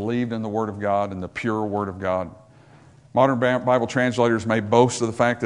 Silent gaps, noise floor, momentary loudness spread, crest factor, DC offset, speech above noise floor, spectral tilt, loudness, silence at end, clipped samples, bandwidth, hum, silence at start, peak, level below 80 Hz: none; -50 dBFS; 8 LU; 20 dB; under 0.1%; 28 dB; -6 dB/octave; -22 LUFS; 0 s; under 0.1%; 11 kHz; none; 0 s; -2 dBFS; -60 dBFS